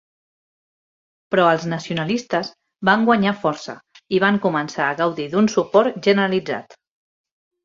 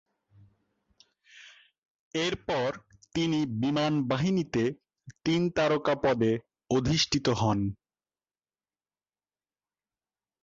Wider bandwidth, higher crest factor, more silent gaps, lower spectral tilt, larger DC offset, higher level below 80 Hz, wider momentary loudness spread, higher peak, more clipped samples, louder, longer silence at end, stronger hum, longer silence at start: about the same, 7.6 kHz vs 7.8 kHz; about the same, 20 dB vs 18 dB; second, none vs 1.78-2.11 s; about the same, -5.5 dB/octave vs -5.5 dB/octave; neither; second, -62 dBFS vs -56 dBFS; about the same, 10 LU vs 9 LU; first, -2 dBFS vs -12 dBFS; neither; first, -19 LUFS vs -28 LUFS; second, 1 s vs 2.7 s; neither; about the same, 1.3 s vs 1.35 s